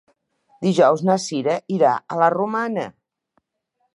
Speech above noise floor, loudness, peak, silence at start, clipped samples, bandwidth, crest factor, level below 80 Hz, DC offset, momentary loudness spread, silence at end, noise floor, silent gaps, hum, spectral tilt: 53 dB; -20 LUFS; -2 dBFS; 0.6 s; under 0.1%; 11 kHz; 18 dB; -72 dBFS; under 0.1%; 9 LU; 1.05 s; -72 dBFS; none; none; -6 dB/octave